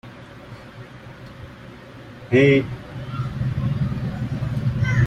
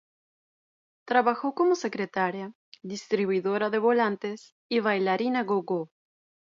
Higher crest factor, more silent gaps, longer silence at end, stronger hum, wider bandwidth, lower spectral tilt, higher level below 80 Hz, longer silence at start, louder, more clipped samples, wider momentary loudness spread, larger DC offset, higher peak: about the same, 18 dB vs 20 dB; second, none vs 2.55-2.72 s, 4.52-4.69 s; second, 0 s vs 0.7 s; neither; about the same, 8 kHz vs 7.6 kHz; first, -8 dB/octave vs -5.5 dB/octave; first, -42 dBFS vs -80 dBFS; second, 0.05 s vs 1.05 s; first, -22 LUFS vs -27 LUFS; neither; first, 24 LU vs 15 LU; neither; first, -4 dBFS vs -8 dBFS